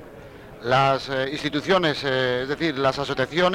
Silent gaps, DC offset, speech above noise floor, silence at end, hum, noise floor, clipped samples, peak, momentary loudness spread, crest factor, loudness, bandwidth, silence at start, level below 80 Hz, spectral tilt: none; under 0.1%; 20 dB; 0 s; none; -42 dBFS; under 0.1%; -8 dBFS; 13 LU; 16 dB; -22 LUFS; 16 kHz; 0 s; -52 dBFS; -5.5 dB/octave